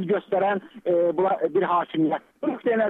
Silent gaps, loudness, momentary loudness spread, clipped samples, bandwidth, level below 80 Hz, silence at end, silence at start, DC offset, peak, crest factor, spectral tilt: none; -24 LUFS; 6 LU; under 0.1%; 4 kHz; -74 dBFS; 0 s; 0 s; under 0.1%; -10 dBFS; 12 dB; -9 dB/octave